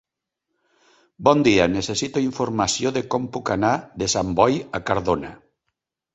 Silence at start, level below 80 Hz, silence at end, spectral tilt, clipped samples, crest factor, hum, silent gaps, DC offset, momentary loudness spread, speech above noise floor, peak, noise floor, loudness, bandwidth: 1.2 s; -48 dBFS; 0.8 s; -4.5 dB/octave; under 0.1%; 22 dB; none; none; under 0.1%; 8 LU; 60 dB; -2 dBFS; -81 dBFS; -21 LUFS; 8.4 kHz